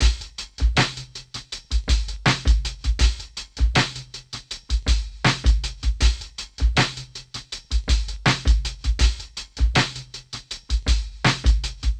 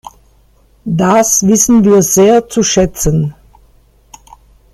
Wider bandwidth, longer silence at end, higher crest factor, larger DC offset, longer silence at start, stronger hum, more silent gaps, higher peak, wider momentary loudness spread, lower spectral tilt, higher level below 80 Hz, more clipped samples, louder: second, 9.4 kHz vs 15.5 kHz; second, 0 s vs 1.4 s; first, 18 dB vs 12 dB; neither; second, 0 s vs 0.85 s; neither; neither; second, -4 dBFS vs 0 dBFS; first, 14 LU vs 10 LU; about the same, -4 dB/octave vs -4.5 dB/octave; first, -24 dBFS vs -34 dBFS; neither; second, -23 LUFS vs -10 LUFS